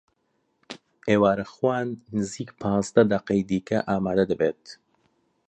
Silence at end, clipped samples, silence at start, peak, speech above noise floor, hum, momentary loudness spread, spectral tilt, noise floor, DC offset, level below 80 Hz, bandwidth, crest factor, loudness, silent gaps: 0.75 s; under 0.1%; 0.7 s; -4 dBFS; 48 dB; none; 14 LU; -6.5 dB/octave; -72 dBFS; under 0.1%; -56 dBFS; 8.8 kHz; 22 dB; -24 LUFS; none